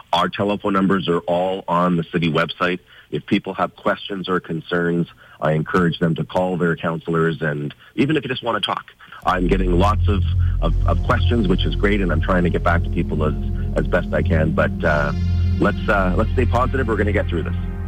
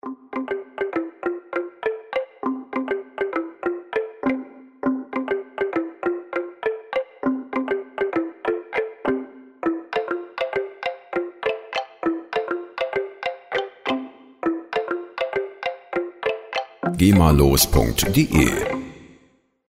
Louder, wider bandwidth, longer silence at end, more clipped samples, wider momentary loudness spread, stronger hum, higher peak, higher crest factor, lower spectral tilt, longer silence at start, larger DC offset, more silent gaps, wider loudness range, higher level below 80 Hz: first, -20 LUFS vs -24 LUFS; second, 10 kHz vs 16 kHz; second, 0 s vs 0.55 s; neither; second, 6 LU vs 11 LU; neither; second, -6 dBFS vs -2 dBFS; second, 12 dB vs 22 dB; first, -7.5 dB/octave vs -5 dB/octave; about the same, 0.1 s vs 0.05 s; neither; neither; second, 3 LU vs 8 LU; first, -28 dBFS vs -36 dBFS